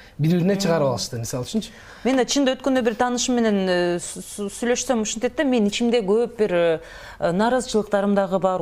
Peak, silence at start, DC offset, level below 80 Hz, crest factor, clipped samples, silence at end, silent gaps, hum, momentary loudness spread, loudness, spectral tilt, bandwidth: -6 dBFS; 0 s; under 0.1%; -50 dBFS; 16 dB; under 0.1%; 0 s; none; none; 8 LU; -22 LUFS; -5 dB/octave; 16 kHz